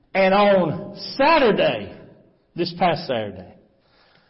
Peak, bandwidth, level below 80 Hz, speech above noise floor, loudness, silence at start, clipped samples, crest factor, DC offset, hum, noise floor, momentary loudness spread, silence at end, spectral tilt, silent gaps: -6 dBFS; 5.8 kHz; -54 dBFS; 39 dB; -20 LUFS; 0.15 s; under 0.1%; 14 dB; under 0.1%; none; -58 dBFS; 15 LU; 0.85 s; -9.5 dB/octave; none